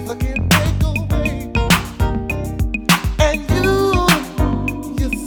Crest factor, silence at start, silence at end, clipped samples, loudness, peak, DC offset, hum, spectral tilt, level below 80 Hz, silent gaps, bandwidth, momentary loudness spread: 16 dB; 0 s; 0 s; under 0.1%; -17 LUFS; 0 dBFS; under 0.1%; none; -5 dB/octave; -24 dBFS; none; over 20 kHz; 7 LU